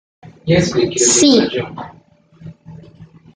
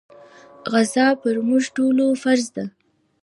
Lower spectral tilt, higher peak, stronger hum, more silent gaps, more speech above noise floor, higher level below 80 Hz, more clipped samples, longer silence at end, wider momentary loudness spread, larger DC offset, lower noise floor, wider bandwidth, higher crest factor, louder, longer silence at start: about the same, -3.5 dB/octave vs -4 dB/octave; first, 0 dBFS vs -4 dBFS; neither; neither; about the same, 29 dB vs 27 dB; first, -48 dBFS vs -72 dBFS; neither; second, 0.3 s vs 0.55 s; first, 23 LU vs 13 LU; neither; about the same, -43 dBFS vs -46 dBFS; second, 9.8 kHz vs 11.5 kHz; about the same, 16 dB vs 16 dB; first, -13 LUFS vs -19 LUFS; second, 0.45 s vs 0.65 s